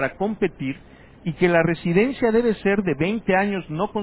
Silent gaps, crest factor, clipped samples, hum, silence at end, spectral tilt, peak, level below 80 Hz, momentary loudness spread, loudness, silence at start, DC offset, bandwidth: none; 18 dB; under 0.1%; none; 0 s; -11 dB/octave; -4 dBFS; -50 dBFS; 12 LU; -22 LUFS; 0 s; under 0.1%; 4 kHz